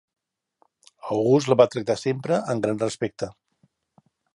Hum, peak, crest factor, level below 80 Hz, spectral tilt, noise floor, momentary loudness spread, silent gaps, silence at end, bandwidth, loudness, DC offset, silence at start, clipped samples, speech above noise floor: none; -2 dBFS; 22 dB; -64 dBFS; -6 dB/octave; -67 dBFS; 13 LU; none; 1.05 s; 11.5 kHz; -23 LUFS; under 0.1%; 1.05 s; under 0.1%; 45 dB